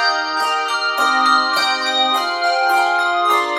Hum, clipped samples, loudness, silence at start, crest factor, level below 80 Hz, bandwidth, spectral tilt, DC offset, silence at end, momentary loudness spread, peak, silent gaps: none; under 0.1%; -16 LUFS; 0 s; 14 dB; -66 dBFS; 16.5 kHz; 0.5 dB/octave; under 0.1%; 0 s; 4 LU; -2 dBFS; none